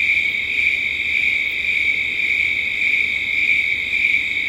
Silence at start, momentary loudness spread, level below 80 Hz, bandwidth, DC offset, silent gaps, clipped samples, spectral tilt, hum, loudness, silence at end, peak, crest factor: 0 s; 2 LU; -50 dBFS; 16.5 kHz; under 0.1%; none; under 0.1%; -1.5 dB/octave; none; -16 LUFS; 0 s; -4 dBFS; 14 dB